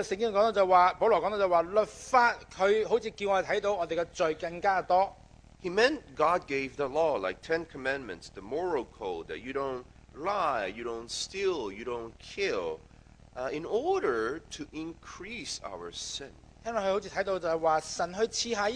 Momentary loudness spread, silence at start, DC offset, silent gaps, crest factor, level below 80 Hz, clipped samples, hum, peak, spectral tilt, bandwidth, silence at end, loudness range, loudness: 14 LU; 0 s; under 0.1%; none; 22 dB; -58 dBFS; under 0.1%; none; -8 dBFS; -3.5 dB/octave; 10.5 kHz; 0 s; 8 LU; -30 LUFS